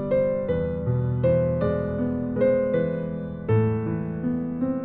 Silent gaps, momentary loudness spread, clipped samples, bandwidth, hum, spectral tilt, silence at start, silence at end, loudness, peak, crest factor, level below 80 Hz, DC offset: none; 6 LU; under 0.1%; 4.3 kHz; none; -12.5 dB/octave; 0 s; 0 s; -25 LUFS; -10 dBFS; 14 dB; -44 dBFS; under 0.1%